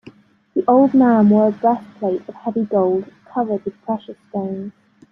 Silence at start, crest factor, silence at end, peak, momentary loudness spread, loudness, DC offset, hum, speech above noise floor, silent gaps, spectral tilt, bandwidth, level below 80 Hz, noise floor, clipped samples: 0.55 s; 16 dB; 0.4 s; -2 dBFS; 14 LU; -18 LUFS; under 0.1%; none; 28 dB; none; -10.5 dB/octave; 3.9 kHz; -62 dBFS; -45 dBFS; under 0.1%